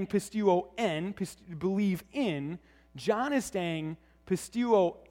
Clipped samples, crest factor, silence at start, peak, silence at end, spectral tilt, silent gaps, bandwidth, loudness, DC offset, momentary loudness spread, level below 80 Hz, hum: under 0.1%; 18 dB; 0 s; -12 dBFS; 0.1 s; -6 dB/octave; none; 16.5 kHz; -31 LUFS; under 0.1%; 12 LU; -62 dBFS; none